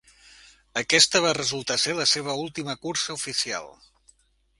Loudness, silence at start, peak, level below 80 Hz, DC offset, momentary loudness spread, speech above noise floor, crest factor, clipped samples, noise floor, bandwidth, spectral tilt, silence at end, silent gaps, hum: -23 LUFS; 0.75 s; -4 dBFS; -62 dBFS; under 0.1%; 14 LU; 36 dB; 24 dB; under 0.1%; -61 dBFS; 11.5 kHz; -1.5 dB/octave; 0.9 s; none; none